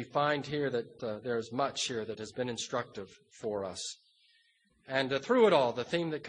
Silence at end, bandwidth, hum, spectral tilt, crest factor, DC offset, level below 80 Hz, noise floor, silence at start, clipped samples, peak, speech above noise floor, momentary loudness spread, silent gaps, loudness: 0 s; 10 kHz; none; -4 dB/octave; 22 dB; under 0.1%; -72 dBFS; -70 dBFS; 0 s; under 0.1%; -12 dBFS; 38 dB; 15 LU; none; -32 LUFS